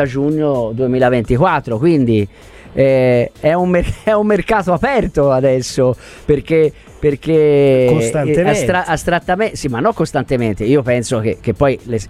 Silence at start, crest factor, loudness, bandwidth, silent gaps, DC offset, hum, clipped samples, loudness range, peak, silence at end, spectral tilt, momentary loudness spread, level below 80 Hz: 0 s; 14 dB; -14 LUFS; 14 kHz; none; under 0.1%; none; under 0.1%; 2 LU; 0 dBFS; 0 s; -6.5 dB/octave; 6 LU; -34 dBFS